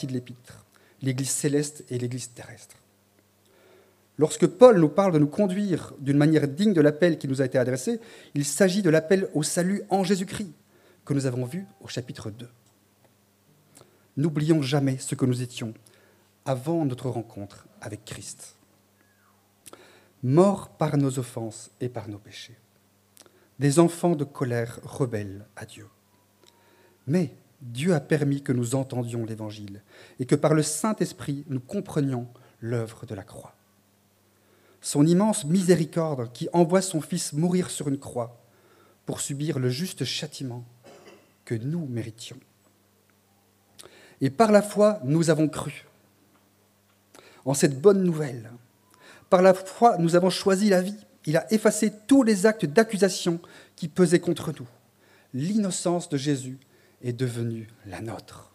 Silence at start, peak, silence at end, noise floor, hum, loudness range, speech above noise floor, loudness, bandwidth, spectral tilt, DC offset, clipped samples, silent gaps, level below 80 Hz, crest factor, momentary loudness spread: 0 s; -2 dBFS; 0.1 s; -63 dBFS; none; 11 LU; 39 dB; -24 LUFS; 15.5 kHz; -6 dB/octave; under 0.1%; under 0.1%; none; -68 dBFS; 24 dB; 19 LU